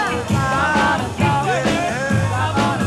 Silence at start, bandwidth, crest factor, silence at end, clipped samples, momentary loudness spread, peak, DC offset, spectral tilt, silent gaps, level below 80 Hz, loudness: 0 s; 13.5 kHz; 14 dB; 0 s; under 0.1%; 3 LU; -4 dBFS; under 0.1%; -5.5 dB/octave; none; -40 dBFS; -18 LUFS